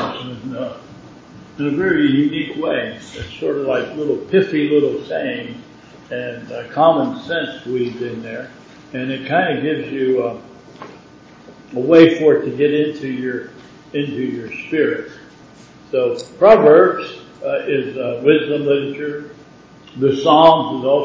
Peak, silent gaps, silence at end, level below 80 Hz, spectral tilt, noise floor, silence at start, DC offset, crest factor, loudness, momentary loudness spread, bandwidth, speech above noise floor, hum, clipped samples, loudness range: 0 dBFS; none; 0 s; -54 dBFS; -7 dB/octave; -43 dBFS; 0 s; under 0.1%; 18 dB; -17 LUFS; 20 LU; 7.8 kHz; 27 dB; none; under 0.1%; 7 LU